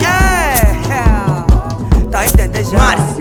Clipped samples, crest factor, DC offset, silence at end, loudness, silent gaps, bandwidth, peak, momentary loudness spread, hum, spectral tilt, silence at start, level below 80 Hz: under 0.1%; 10 dB; under 0.1%; 0 s; -12 LUFS; none; 20 kHz; 0 dBFS; 4 LU; none; -5 dB/octave; 0 s; -14 dBFS